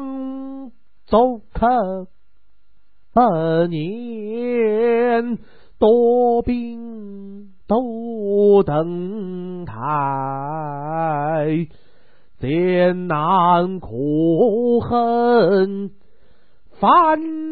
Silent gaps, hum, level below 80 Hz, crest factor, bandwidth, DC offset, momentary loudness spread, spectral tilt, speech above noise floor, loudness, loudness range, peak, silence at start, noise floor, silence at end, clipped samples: none; none; -46 dBFS; 18 dB; 4.8 kHz; 1%; 15 LU; -12 dB/octave; 45 dB; -18 LUFS; 5 LU; -2 dBFS; 0 s; -63 dBFS; 0 s; under 0.1%